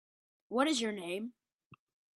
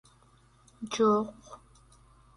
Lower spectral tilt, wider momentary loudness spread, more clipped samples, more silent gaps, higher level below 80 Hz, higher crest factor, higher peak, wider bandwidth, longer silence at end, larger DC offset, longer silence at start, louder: second, -3 dB/octave vs -5 dB/octave; second, 10 LU vs 26 LU; neither; first, 1.53-1.59 s, 1.66-1.71 s vs none; second, -82 dBFS vs -64 dBFS; about the same, 22 dB vs 20 dB; about the same, -16 dBFS vs -14 dBFS; first, 12.5 kHz vs 11 kHz; second, 0.4 s vs 0.8 s; neither; second, 0.5 s vs 0.8 s; second, -34 LUFS vs -28 LUFS